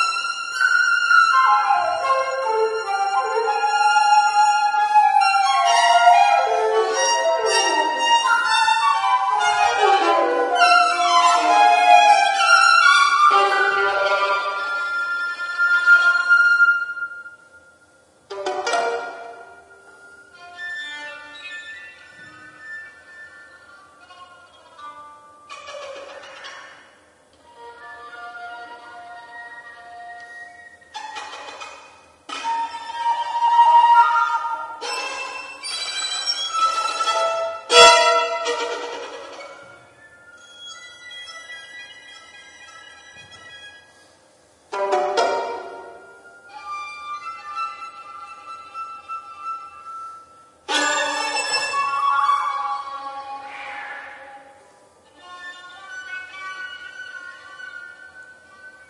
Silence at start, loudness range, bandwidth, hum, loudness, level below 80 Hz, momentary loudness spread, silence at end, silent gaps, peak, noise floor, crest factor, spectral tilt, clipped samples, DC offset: 0 s; 23 LU; 11.5 kHz; none; -17 LUFS; -70 dBFS; 24 LU; 0.2 s; none; 0 dBFS; -55 dBFS; 20 dB; 0.5 dB/octave; under 0.1%; under 0.1%